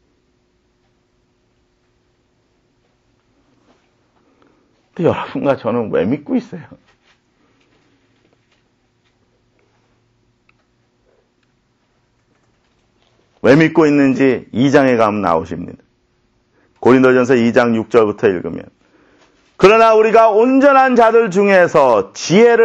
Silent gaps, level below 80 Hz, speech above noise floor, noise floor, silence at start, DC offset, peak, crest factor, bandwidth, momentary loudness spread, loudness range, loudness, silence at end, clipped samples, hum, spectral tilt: none; -54 dBFS; 49 dB; -61 dBFS; 5 s; under 0.1%; 0 dBFS; 16 dB; 8.4 kHz; 12 LU; 13 LU; -12 LUFS; 0 s; under 0.1%; none; -6 dB/octave